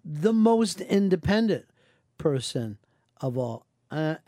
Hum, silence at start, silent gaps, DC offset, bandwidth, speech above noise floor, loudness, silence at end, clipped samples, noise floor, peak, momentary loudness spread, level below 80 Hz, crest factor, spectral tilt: none; 0.05 s; none; under 0.1%; 14 kHz; 37 dB; -26 LUFS; 0.1 s; under 0.1%; -61 dBFS; -8 dBFS; 13 LU; -56 dBFS; 18 dB; -6 dB/octave